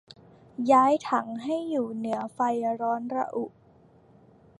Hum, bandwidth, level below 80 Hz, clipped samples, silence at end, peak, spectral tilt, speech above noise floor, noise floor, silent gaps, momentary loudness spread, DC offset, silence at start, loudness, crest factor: none; 11.5 kHz; -72 dBFS; under 0.1%; 1.1 s; -8 dBFS; -6 dB/octave; 31 dB; -57 dBFS; none; 12 LU; under 0.1%; 0.6 s; -27 LUFS; 20 dB